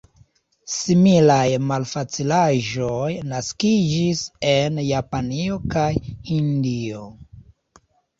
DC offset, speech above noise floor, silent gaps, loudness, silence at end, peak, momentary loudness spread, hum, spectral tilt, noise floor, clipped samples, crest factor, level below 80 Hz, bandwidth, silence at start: under 0.1%; 37 dB; none; -20 LUFS; 0.75 s; -2 dBFS; 11 LU; none; -5.5 dB/octave; -57 dBFS; under 0.1%; 18 dB; -46 dBFS; 8 kHz; 0.65 s